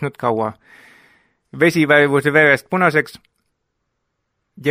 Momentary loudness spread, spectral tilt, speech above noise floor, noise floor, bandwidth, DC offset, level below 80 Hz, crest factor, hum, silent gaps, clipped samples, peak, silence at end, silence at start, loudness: 11 LU; -6 dB/octave; 57 dB; -73 dBFS; 16 kHz; under 0.1%; -62 dBFS; 18 dB; none; none; under 0.1%; 0 dBFS; 0 s; 0 s; -15 LUFS